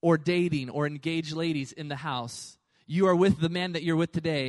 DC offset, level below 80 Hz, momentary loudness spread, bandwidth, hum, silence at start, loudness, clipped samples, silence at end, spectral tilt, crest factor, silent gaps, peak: under 0.1%; -60 dBFS; 12 LU; 11.5 kHz; none; 0.05 s; -28 LUFS; under 0.1%; 0 s; -6.5 dB/octave; 16 dB; none; -10 dBFS